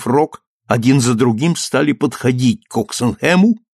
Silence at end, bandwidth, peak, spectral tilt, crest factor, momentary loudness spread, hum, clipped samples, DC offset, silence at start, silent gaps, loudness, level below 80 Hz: 0.15 s; 13 kHz; -2 dBFS; -5.5 dB/octave; 14 dB; 7 LU; none; under 0.1%; under 0.1%; 0 s; 0.47-0.60 s; -15 LUFS; -52 dBFS